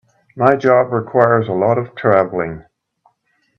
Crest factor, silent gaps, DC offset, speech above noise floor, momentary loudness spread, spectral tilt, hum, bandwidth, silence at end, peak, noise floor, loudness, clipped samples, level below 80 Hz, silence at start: 16 dB; none; under 0.1%; 49 dB; 9 LU; -8.5 dB/octave; none; 6.6 kHz; 0.95 s; 0 dBFS; -63 dBFS; -15 LUFS; under 0.1%; -56 dBFS; 0.35 s